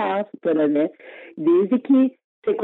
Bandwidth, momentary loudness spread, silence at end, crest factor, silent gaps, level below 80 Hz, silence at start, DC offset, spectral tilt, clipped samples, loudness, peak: 4 kHz; 9 LU; 0 s; 12 dB; 2.24-2.42 s; -76 dBFS; 0 s; under 0.1%; -9.5 dB/octave; under 0.1%; -21 LUFS; -8 dBFS